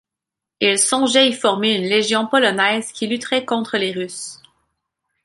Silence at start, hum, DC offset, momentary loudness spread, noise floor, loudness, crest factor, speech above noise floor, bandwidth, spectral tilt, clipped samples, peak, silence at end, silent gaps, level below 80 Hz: 0.6 s; none; under 0.1%; 10 LU; -85 dBFS; -17 LUFS; 18 dB; 67 dB; 11.5 kHz; -2 dB/octave; under 0.1%; -2 dBFS; 0.9 s; none; -66 dBFS